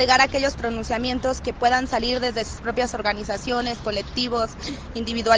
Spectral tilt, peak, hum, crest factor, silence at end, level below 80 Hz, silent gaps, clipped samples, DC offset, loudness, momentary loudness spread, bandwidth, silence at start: -3.5 dB/octave; -4 dBFS; none; 18 dB; 0 s; -40 dBFS; none; under 0.1%; under 0.1%; -24 LUFS; 8 LU; 9.6 kHz; 0 s